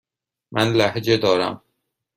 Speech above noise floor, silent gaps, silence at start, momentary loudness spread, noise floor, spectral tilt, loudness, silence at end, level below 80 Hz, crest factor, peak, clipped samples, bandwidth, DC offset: 56 dB; none; 0.5 s; 10 LU; -75 dBFS; -5.5 dB/octave; -20 LUFS; 0.6 s; -56 dBFS; 18 dB; -4 dBFS; under 0.1%; 15.5 kHz; under 0.1%